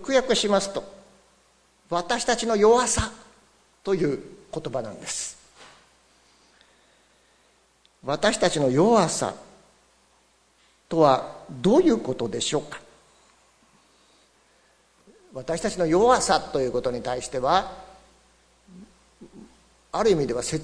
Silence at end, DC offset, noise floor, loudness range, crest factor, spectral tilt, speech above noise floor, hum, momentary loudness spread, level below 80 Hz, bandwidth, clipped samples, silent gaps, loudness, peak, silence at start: 0 s; under 0.1%; -62 dBFS; 10 LU; 22 dB; -4 dB/octave; 39 dB; none; 16 LU; -52 dBFS; 11 kHz; under 0.1%; none; -23 LUFS; -4 dBFS; 0 s